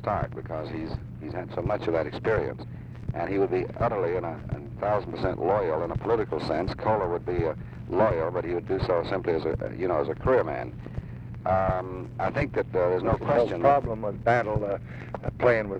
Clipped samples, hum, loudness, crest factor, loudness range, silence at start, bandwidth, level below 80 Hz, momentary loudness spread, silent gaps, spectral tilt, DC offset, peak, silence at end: under 0.1%; none; -27 LUFS; 18 dB; 3 LU; 0 s; 8.4 kHz; -44 dBFS; 12 LU; none; -8.5 dB/octave; under 0.1%; -10 dBFS; 0 s